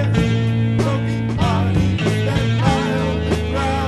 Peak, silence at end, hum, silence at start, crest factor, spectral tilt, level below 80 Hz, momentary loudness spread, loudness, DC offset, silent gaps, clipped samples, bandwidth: -2 dBFS; 0 s; none; 0 s; 16 dB; -7 dB/octave; -32 dBFS; 3 LU; -18 LUFS; under 0.1%; none; under 0.1%; 12 kHz